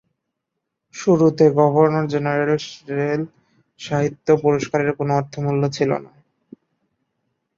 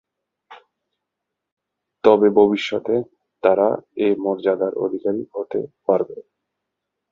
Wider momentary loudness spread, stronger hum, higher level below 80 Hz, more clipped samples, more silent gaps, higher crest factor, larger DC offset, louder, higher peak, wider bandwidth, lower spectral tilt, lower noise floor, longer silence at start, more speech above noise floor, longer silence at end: about the same, 11 LU vs 12 LU; neither; about the same, -60 dBFS vs -62 dBFS; neither; second, none vs 1.52-1.57 s; about the same, 18 dB vs 22 dB; neither; about the same, -19 LUFS vs -20 LUFS; about the same, -2 dBFS vs 0 dBFS; about the same, 7.6 kHz vs 7.2 kHz; about the same, -7 dB/octave vs -7 dB/octave; about the same, -79 dBFS vs -82 dBFS; first, 0.95 s vs 0.5 s; about the same, 61 dB vs 63 dB; first, 1.5 s vs 0.9 s